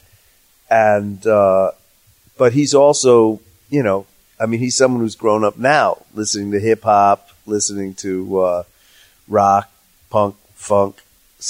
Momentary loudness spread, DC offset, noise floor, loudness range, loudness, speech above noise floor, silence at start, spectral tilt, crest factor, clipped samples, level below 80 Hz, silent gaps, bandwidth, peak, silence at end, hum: 11 LU; under 0.1%; -54 dBFS; 4 LU; -16 LUFS; 39 dB; 0.7 s; -4.5 dB/octave; 16 dB; under 0.1%; -58 dBFS; none; 16 kHz; -2 dBFS; 0 s; none